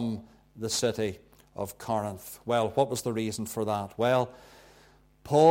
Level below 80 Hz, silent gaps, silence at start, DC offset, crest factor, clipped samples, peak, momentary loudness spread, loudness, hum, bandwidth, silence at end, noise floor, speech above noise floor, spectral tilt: -62 dBFS; none; 0 s; under 0.1%; 20 dB; under 0.1%; -8 dBFS; 12 LU; -30 LUFS; none; 17 kHz; 0 s; -59 dBFS; 31 dB; -5 dB/octave